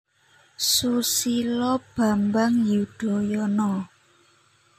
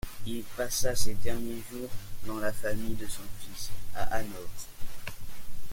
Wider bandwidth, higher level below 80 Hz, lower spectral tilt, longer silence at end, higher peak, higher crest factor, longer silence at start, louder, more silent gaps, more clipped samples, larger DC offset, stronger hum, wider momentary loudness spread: about the same, 16 kHz vs 17 kHz; second, -60 dBFS vs -42 dBFS; about the same, -4 dB/octave vs -3.5 dB/octave; first, 0.95 s vs 0 s; about the same, -8 dBFS vs -10 dBFS; about the same, 16 dB vs 14 dB; first, 0.6 s vs 0.05 s; first, -23 LUFS vs -36 LUFS; neither; neither; neither; neither; second, 6 LU vs 13 LU